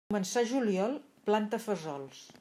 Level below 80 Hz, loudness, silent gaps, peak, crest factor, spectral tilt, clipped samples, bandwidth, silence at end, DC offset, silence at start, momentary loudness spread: -78 dBFS; -32 LUFS; none; -14 dBFS; 18 dB; -5 dB/octave; under 0.1%; 15.5 kHz; 0.1 s; under 0.1%; 0.1 s; 11 LU